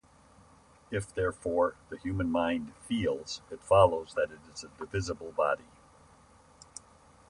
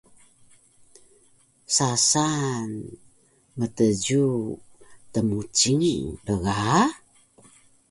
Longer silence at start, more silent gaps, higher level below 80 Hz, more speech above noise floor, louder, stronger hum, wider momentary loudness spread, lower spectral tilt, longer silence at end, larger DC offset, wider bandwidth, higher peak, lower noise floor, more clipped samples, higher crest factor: second, 0.9 s vs 1.7 s; neither; about the same, -54 dBFS vs -52 dBFS; second, 29 dB vs 37 dB; second, -31 LUFS vs -23 LUFS; neither; first, 19 LU vs 15 LU; first, -5.5 dB/octave vs -4 dB/octave; first, 1.65 s vs 0.95 s; neither; about the same, 11.5 kHz vs 11.5 kHz; about the same, -10 dBFS vs -8 dBFS; about the same, -59 dBFS vs -60 dBFS; neither; about the same, 22 dB vs 18 dB